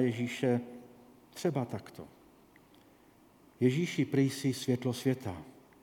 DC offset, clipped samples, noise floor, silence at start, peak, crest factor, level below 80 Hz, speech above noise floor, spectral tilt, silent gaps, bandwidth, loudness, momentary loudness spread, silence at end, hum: under 0.1%; under 0.1%; -62 dBFS; 0 s; -14 dBFS; 20 dB; -72 dBFS; 30 dB; -6.5 dB/octave; none; 18 kHz; -33 LUFS; 21 LU; 0.3 s; none